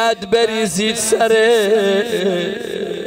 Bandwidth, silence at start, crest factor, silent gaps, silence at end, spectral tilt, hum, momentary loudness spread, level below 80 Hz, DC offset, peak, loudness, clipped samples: 16 kHz; 0 s; 12 dB; none; 0 s; -3 dB/octave; none; 9 LU; -54 dBFS; under 0.1%; -4 dBFS; -16 LUFS; under 0.1%